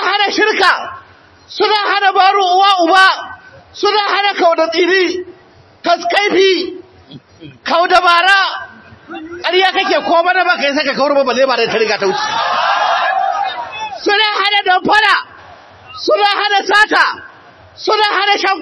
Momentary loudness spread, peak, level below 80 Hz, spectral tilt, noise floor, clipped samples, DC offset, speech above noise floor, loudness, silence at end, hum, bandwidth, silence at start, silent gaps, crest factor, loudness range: 13 LU; 0 dBFS; -58 dBFS; -2.5 dB/octave; -44 dBFS; 0.2%; under 0.1%; 32 dB; -12 LUFS; 0 s; none; 11 kHz; 0 s; none; 14 dB; 3 LU